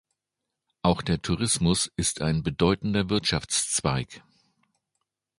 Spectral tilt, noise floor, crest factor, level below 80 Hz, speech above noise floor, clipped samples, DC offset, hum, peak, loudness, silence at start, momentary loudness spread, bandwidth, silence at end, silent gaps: -4 dB/octave; -85 dBFS; 22 dB; -46 dBFS; 59 dB; under 0.1%; under 0.1%; none; -6 dBFS; -25 LUFS; 0.85 s; 4 LU; 11.5 kHz; 1.2 s; none